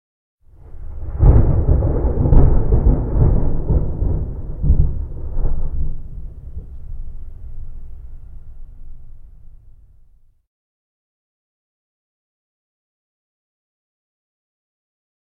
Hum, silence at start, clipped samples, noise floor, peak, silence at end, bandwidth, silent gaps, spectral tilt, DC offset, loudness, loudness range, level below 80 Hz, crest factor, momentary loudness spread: none; 0.7 s; under 0.1%; -49 dBFS; 0 dBFS; 5.7 s; 2 kHz; none; -13.5 dB/octave; under 0.1%; -19 LUFS; 23 LU; -20 dBFS; 18 dB; 23 LU